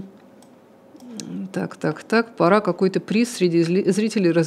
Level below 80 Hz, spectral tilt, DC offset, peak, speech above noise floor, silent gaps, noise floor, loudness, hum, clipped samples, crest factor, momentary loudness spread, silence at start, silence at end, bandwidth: -76 dBFS; -6 dB/octave; under 0.1%; -2 dBFS; 30 dB; none; -49 dBFS; -21 LUFS; none; under 0.1%; 20 dB; 14 LU; 0 s; 0 s; 13 kHz